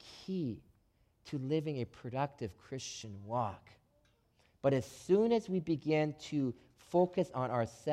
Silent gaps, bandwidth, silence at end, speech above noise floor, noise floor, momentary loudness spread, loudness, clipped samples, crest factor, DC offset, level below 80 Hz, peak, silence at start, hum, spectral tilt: none; 14 kHz; 0 s; 37 dB; -72 dBFS; 13 LU; -36 LUFS; under 0.1%; 18 dB; under 0.1%; -68 dBFS; -18 dBFS; 0.05 s; none; -6.5 dB/octave